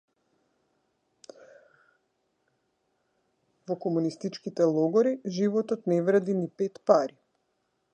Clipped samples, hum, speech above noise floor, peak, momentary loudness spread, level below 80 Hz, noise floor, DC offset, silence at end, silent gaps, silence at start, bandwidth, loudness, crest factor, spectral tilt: under 0.1%; none; 50 dB; -6 dBFS; 10 LU; -82 dBFS; -76 dBFS; under 0.1%; 0.85 s; none; 3.7 s; 9.4 kHz; -27 LUFS; 22 dB; -7 dB/octave